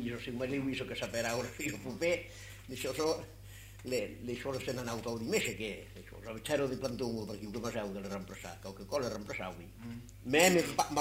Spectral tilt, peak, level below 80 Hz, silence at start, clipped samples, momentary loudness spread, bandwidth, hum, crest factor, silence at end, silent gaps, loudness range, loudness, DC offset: -4 dB/octave; -10 dBFS; -58 dBFS; 0 s; under 0.1%; 15 LU; 16 kHz; none; 26 dB; 0 s; none; 5 LU; -35 LUFS; under 0.1%